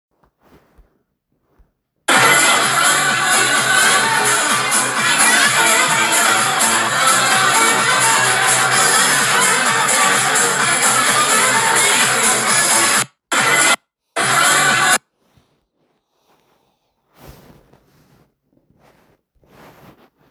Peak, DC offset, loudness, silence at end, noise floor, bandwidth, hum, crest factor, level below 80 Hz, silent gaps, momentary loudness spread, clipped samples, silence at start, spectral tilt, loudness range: 0 dBFS; under 0.1%; -12 LUFS; 3 s; -67 dBFS; over 20 kHz; none; 16 dB; -58 dBFS; none; 3 LU; under 0.1%; 2.1 s; -0.5 dB/octave; 4 LU